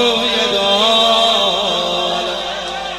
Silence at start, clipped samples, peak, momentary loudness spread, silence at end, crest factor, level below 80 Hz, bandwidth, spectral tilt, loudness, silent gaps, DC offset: 0 s; under 0.1%; -2 dBFS; 10 LU; 0 s; 14 dB; -46 dBFS; 14.5 kHz; -2 dB/octave; -14 LUFS; none; under 0.1%